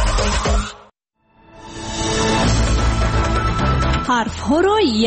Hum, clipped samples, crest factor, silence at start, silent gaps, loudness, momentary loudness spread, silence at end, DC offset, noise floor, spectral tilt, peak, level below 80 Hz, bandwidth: none; under 0.1%; 12 dB; 0 s; none; -18 LUFS; 8 LU; 0 s; under 0.1%; -59 dBFS; -5 dB/octave; -6 dBFS; -22 dBFS; 8.8 kHz